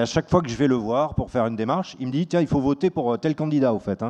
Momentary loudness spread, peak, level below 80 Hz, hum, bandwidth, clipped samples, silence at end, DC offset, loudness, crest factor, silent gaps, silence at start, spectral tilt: 4 LU; -4 dBFS; -46 dBFS; none; 8.8 kHz; under 0.1%; 0 s; under 0.1%; -23 LUFS; 18 dB; none; 0 s; -7 dB/octave